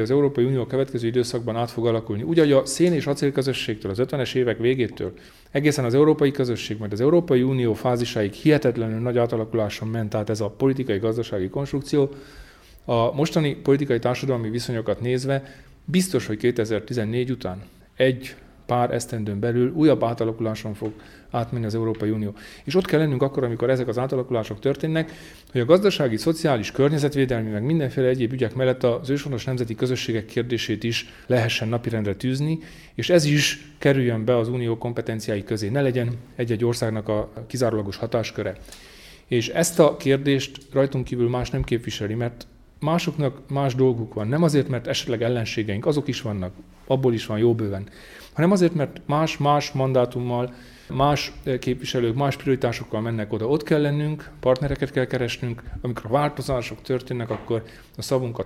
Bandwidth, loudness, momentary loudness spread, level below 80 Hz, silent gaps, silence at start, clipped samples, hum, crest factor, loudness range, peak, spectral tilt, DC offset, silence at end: 15.5 kHz; -23 LUFS; 9 LU; -48 dBFS; none; 0 s; under 0.1%; none; 20 dB; 3 LU; -2 dBFS; -6 dB/octave; under 0.1%; 0 s